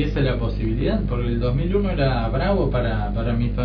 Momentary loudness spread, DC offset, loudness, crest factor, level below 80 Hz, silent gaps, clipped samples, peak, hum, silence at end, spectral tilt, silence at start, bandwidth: 3 LU; under 0.1%; -22 LUFS; 14 dB; -26 dBFS; none; under 0.1%; -8 dBFS; 50 Hz at -25 dBFS; 0 s; -10 dB/octave; 0 s; 5.4 kHz